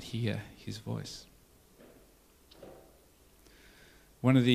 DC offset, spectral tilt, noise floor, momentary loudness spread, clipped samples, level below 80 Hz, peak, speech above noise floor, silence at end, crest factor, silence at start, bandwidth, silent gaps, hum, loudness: under 0.1%; -6.5 dB/octave; -62 dBFS; 29 LU; under 0.1%; -62 dBFS; -10 dBFS; 32 dB; 0 s; 24 dB; 0 s; 15 kHz; none; none; -34 LUFS